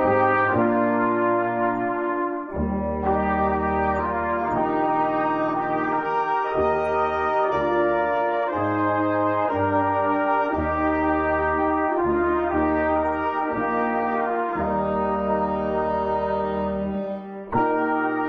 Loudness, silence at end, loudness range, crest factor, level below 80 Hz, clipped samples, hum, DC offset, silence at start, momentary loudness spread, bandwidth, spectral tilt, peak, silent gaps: -23 LUFS; 0 s; 2 LU; 14 dB; -46 dBFS; under 0.1%; none; under 0.1%; 0 s; 4 LU; 6.2 kHz; -9 dB/octave; -8 dBFS; none